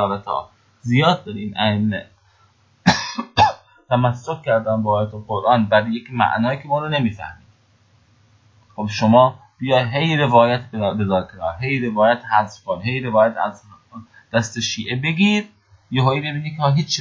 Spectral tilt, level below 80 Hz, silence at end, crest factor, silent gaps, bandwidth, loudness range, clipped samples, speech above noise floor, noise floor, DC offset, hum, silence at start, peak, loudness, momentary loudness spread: -5.5 dB/octave; -48 dBFS; 0 s; 20 dB; none; 7.6 kHz; 3 LU; under 0.1%; 38 dB; -57 dBFS; under 0.1%; none; 0 s; 0 dBFS; -19 LUFS; 11 LU